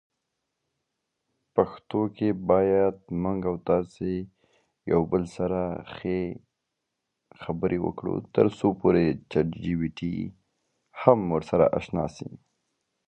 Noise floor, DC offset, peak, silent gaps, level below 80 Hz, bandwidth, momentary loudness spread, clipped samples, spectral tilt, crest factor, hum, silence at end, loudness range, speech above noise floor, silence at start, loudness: -82 dBFS; under 0.1%; -2 dBFS; none; -52 dBFS; 9 kHz; 12 LU; under 0.1%; -8.5 dB/octave; 26 dB; none; 0.7 s; 5 LU; 57 dB; 1.55 s; -26 LUFS